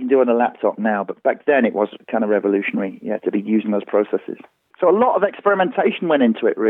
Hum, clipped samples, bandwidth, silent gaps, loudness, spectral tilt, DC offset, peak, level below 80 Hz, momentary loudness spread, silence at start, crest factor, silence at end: none; under 0.1%; 3.9 kHz; none; -19 LUFS; -9.5 dB/octave; under 0.1%; -4 dBFS; -78 dBFS; 8 LU; 0 s; 16 dB; 0 s